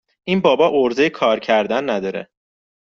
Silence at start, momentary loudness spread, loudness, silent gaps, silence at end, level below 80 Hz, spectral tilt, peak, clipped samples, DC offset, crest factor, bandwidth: 0.25 s; 8 LU; -17 LUFS; none; 0.65 s; -60 dBFS; -3.5 dB/octave; -2 dBFS; under 0.1%; under 0.1%; 16 dB; 7.2 kHz